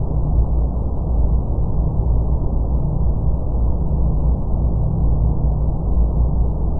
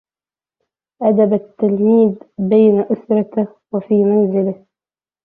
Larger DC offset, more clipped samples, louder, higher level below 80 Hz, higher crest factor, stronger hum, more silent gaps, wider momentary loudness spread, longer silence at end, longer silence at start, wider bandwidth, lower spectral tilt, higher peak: neither; neither; second, -20 LUFS vs -15 LUFS; first, -18 dBFS vs -62 dBFS; about the same, 12 dB vs 14 dB; neither; neither; second, 2 LU vs 10 LU; second, 0 s vs 0.7 s; second, 0 s vs 1 s; second, 1.4 kHz vs 3.7 kHz; first, -14.5 dB/octave vs -13 dB/octave; about the same, -4 dBFS vs -2 dBFS